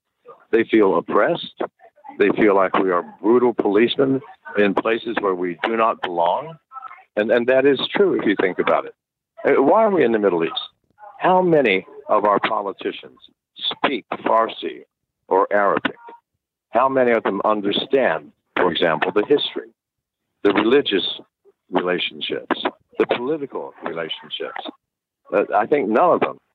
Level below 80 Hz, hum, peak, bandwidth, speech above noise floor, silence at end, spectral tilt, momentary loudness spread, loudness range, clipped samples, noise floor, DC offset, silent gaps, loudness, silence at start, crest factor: -66 dBFS; none; -6 dBFS; 4.8 kHz; 63 dB; 0.2 s; -7.5 dB/octave; 12 LU; 5 LU; under 0.1%; -82 dBFS; under 0.1%; none; -19 LUFS; 0.3 s; 14 dB